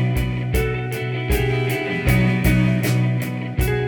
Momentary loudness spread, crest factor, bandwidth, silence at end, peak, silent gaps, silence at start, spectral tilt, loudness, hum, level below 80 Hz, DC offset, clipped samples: 7 LU; 16 dB; 19 kHz; 0 s; -4 dBFS; none; 0 s; -6.5 dB/octave; -20 LUFS; none; -28 dBFS; under 0.1%; under 0.1%